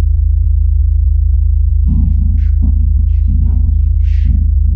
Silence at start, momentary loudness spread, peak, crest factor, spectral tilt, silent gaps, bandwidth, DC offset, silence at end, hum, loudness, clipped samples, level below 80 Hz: 0 s; 1 LU; 0 dBFS; 8 dB; -11.5 dB/octave; none; 0.7 kHz; under 0.1%; 0 s; none; -13 LUFS; under 0.1%; -10 dBFS